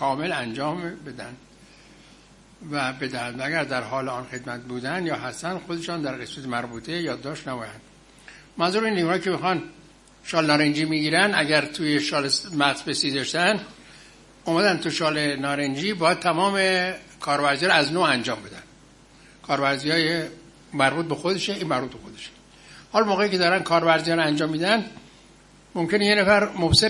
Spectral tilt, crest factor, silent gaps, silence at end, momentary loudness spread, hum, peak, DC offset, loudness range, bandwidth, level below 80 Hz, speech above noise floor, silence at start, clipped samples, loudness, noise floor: -4 dB/octave; 22 dB; none; 0 s; 15 LU; none; -2 dBFS; under 0.1%; 8 LU; 11.5 kHz; -54 dBFS; 28 dB; 0 s; under 0.1%; -23 LUFS; -52 dBFS